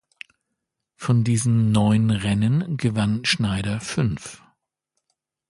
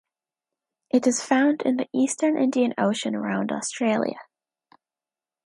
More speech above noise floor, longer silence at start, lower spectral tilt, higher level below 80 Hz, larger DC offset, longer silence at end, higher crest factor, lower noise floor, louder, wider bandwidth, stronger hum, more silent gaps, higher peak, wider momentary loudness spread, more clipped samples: second, 60 dB vs over 67 dB; about the same, 1 s vs 0.95 s; first, -5.5 dB/octave vs -4 dB/octave; first, -48 dBFS vs -76 dBFS; neither; about the same, 1.15 s vs 1.25 s; about the same, 16 dB vs 18 dB; second, -80 dBFS vs under -90 dBFS; about the same, -21 LUFS vs -23 LUFS; about the same, 11.5 kHz vs 11.5 kHz; neither; neither; about the same, -6 dBFS vs -6 dBFS; about the same, 7 LU vs 6 LU; neither